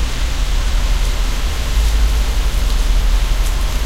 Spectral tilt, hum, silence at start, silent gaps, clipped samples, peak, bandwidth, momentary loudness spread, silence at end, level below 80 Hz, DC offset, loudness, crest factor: -4 dB/octave; none; 0 s; none; under 0.1%; -4 dBFS; 15.5 kHz; 4 LU; 0 s; -14 dBFS; 0.4%; -19 LUFS; 10 dB